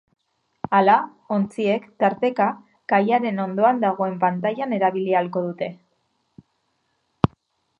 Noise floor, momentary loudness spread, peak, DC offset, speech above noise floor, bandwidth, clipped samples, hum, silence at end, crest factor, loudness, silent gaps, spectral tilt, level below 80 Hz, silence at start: -71 dBFS; 8 LU; 0 dBFS; under 0.1%; 50 dB; 10.5 kHz; under 0.1%; none; 0.5 s; 22 dB; -22 LUFS; none; -8 dB/octave; -54 dBFS; 0.7 s